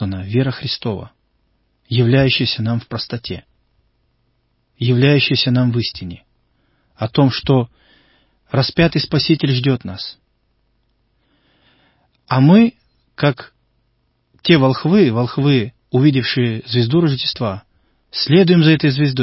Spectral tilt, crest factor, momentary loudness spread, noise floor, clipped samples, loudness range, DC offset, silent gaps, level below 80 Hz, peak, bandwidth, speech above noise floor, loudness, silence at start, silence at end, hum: -10 dB/octave; 18 dB; 15 LU; -64 dBFS; under 0.1%; 4 LU; under 0.1%; none; -46 dBFS; 0 dBFS; 5.8 kHz; 49 dB; -16 LUFS; 0 s; 0 s; none